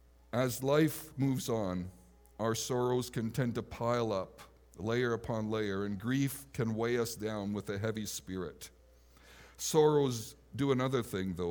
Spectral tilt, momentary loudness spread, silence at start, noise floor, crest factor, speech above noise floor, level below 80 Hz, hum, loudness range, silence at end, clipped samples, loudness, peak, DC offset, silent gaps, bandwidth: -5.5 dB/octave; 11 LU; 0.35 s; -61 dBFS; 20 dB; 28 dB; -62 dBFS; none; 3 LU; 0 s; under 0.1%; -34 LUFS; -14 dBFS; under 0.1%; none; over 20 kHz